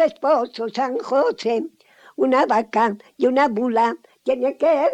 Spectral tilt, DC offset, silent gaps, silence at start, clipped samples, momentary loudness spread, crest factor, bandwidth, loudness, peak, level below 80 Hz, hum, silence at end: -5.5 dB/octave; under 0.1%; none; 0 s; under 0.1%; 7 LU; 14 dB; 9.2 kHz; -20 LUFS; -6 dBFS; -66 dBFS; none; 0 s